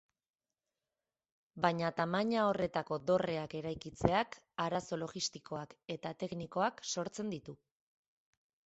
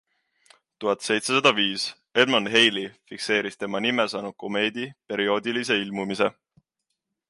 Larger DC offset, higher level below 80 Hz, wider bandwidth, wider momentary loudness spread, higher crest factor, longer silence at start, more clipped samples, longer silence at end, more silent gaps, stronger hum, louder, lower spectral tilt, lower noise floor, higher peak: neither; first, -64 dBFS vs -72 dBFS; second, 8.2 kHz vs 11.5 kHz; about the same, 11 LU vs 12 LU; first, 28 dB vs 22 dB; first, 1.55 s vs 0.8 s; neither; about the same, 1.1 s vs 1 s; neither; neither; second, -37 LUFS vs -23 LUFS; first, -4.5 dB/octave vs -3 dB/octave; first, under -90 dBFS vs -81 dBFS; second, -10 dBFS vs -4 dBFS